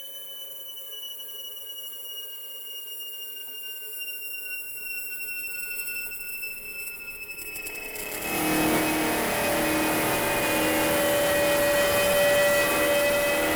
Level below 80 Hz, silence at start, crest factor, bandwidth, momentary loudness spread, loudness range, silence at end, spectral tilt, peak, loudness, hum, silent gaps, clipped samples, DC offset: -52 dBFS; 0 s; 14 dB; over 20 kHz; 13 LU; 12 LU; 0 s; -2.5 dB/octave; -12 dBFS; -26 LUFS; none; none; under 0.1%; under 0.1%